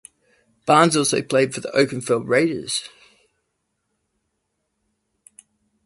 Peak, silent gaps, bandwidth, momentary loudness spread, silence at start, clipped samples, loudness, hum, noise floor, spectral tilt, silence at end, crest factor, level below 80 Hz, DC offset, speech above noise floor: 0 dBFS; none; 11.5 kHz; 10 LU; 0.65 s; under 0.1%; -19 LUFS; none; -75 dBFS; -4 dB/octave; 3 s; 22 dB; -64 dBFS; under 0.1%; 56 dB